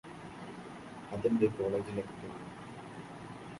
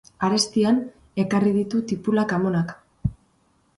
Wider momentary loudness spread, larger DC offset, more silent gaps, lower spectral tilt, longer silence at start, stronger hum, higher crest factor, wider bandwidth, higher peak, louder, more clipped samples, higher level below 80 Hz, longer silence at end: first, 17 LU vs 10 LU; neither; neither; first, -7.5 dB/octave vs -5.5 dB/octave; second, 0.05 s vs 0.2 s; neither; about the same, 20 dB vs 16 dB; about the same, 11.5 kHz vs 11.5 kHz; second, -16 dBFS vs -6 dBFS; second, -37 LUFS vs -23 LUFS; neither; second, -64 dBFS vs -48 dBFS; second, 0 s vs 0.65 s